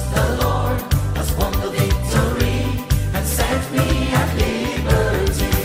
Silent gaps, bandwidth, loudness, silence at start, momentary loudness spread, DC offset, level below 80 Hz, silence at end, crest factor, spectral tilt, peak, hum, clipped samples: none; 16 kHz; -19 LUFS; 0 s; 3 LU; under 0.1%; -24 dBFS; 0 s; 16 dB; -5.5 dB/octave; -2 dBFS; none; under 0.1%